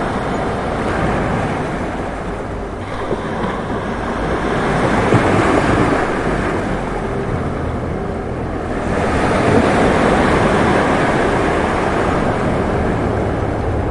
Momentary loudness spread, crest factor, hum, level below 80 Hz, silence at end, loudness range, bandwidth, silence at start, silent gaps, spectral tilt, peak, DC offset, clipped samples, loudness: 9 LU; 16 dB; none; -30 dBFS; 0 s; 6 LU; 11.5 kHz; 0 s; none; -6.5 dB/octave; 0 dBFS; 0.2%; under 0.1%; -17 LUFS